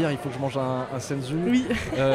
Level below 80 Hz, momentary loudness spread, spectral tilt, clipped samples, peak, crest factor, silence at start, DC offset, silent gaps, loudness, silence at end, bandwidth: -48 dBFS; 6 LU; -6 dB/octave; under 0.1%; -12 dBFS; 14 dB; 0 s; under 0.1%; none; -26 LUFS; 0 s; 14.5 kHz